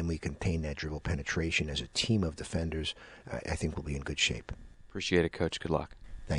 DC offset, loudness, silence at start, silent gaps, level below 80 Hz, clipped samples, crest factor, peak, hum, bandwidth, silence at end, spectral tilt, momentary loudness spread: under 0.1%; -33 LUFS; 0 s; none; -44 dBFS; under 0.1%; 20 dB; -14 dBFS; none; 11 kHz; 0 s; -4.5 dB/octave; 13 LU